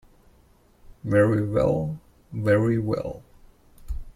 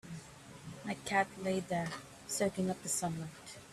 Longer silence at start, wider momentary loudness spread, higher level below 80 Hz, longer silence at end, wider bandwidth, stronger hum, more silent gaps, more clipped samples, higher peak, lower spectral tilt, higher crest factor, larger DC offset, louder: first, 1.05 s vs 0.05 s; first, 19 LU vs 16 LU; first, -42 dBFS vs -68 dBFS; about the same, 0.05 s vs 0 s; second, 12.5 kHz vs 14 kHz; neither; neither; neither; first, -6 dBFS vs -18 dBFS; first, -9 dB/octave vs -4 dB/octave; about the same, 20 dB vs 20 dB; neither; first, -24 LUFS vs -37 LUFS